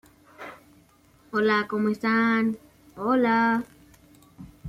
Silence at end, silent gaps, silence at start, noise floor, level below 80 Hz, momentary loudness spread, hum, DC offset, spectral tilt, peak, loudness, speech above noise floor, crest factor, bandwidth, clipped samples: 0 s; none; 0.4 s; -58 dBFS; -64 dBFS; 21 LU; none; under 0.1%; -6.5 dB/octave; -10 dBFS; -24 LUFS; 35 dB; 16 dB; 13.5 kHz; under 0.1%